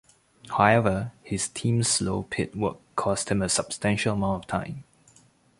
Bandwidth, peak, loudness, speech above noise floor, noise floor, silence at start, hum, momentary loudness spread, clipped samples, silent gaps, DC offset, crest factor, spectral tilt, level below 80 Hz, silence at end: 11.5 kHz; -4 dBFS; -26 LUFS; 34 dB; -59 dBFS; 0.45 s; none; 10 LU; under 0.1%; none; under 0.1%; 24 dB; -4.5 dB/octave; -50 dBFS; 0.75 s